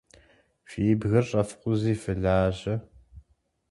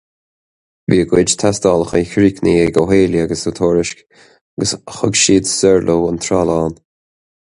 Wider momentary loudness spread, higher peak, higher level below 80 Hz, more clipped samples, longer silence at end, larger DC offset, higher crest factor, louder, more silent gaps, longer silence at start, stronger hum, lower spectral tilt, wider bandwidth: about the same, 9 LU vs 8 LU; second, -10 dBFS vs 0 dBFS; second, -46 dBFS vs -40 dBFS; neither; second, 0.5 s vs 0.85 s; neither; about the same, 18 dB vs 16 dB; second, -26 LUFS vs -14 LUFS; second, none vs 4.41-4.57 s; second, 0.7 s vs 0.9 s; neither; first, -7.5 dB/octave vs -4.5 dB/octave; about the same, 11.5 kHz vs 11.5 kHz